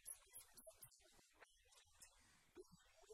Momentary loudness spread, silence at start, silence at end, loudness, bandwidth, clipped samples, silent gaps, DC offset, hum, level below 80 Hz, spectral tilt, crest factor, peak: 11 LU; 0 s; 0 s; -64 LUFS; 16 kHz; under 0.1%; none; under 0.1%; none; -82 dBFS; -1.5 dB/octave; 24 dB; -42 dBFS